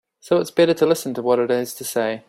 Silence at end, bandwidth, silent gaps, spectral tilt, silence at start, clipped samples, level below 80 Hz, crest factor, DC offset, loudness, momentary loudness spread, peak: 0.1 s; 16 kHz; none; -4.5 dB/octave; 0.25 s; under 0.1%; -64 dBFS; 16 dB; under 0.1%; -20 LUFS; 6 LU; -4 dBFS